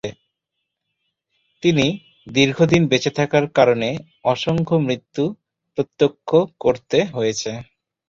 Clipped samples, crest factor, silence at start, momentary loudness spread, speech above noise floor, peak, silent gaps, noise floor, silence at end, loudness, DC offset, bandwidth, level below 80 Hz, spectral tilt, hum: under 0.1%; 18 dB; 0.05 s; 11 LU; 60 dB; -2 dBFS; none; -79 dBFS; 0.45 s; -19 LUFS; under 0.1%; 7.8 kHz; -54 dBFS; -5.5 dB/octave; none